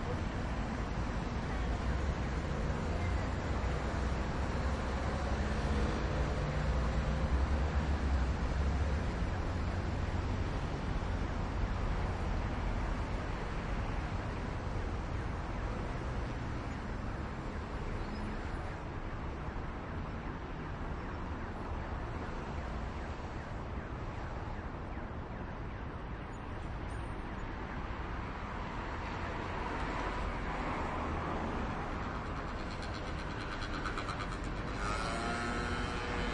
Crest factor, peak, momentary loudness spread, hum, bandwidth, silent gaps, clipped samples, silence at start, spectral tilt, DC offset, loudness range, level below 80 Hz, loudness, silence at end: 14 dB; -22 dBFS; 8 LU; none; 10.5 kHz; none; under 0.1%; 0 s; -6.5 dB/octave; under 0.1%; 7 LU; -40 dBFS; -38 LUFS; 0 s